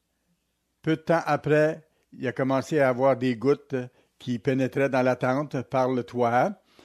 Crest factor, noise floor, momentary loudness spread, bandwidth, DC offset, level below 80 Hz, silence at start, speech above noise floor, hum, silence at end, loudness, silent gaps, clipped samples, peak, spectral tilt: 16 dB; -75 dBFS; 11 LU; 13.5 kHz; under 0.1%; -68 dBFS; 0.85 s; 51 dB; none; 0.3 s; -25 LUFS; none; under 0.1%; -10 dBFS; -7 dB/octave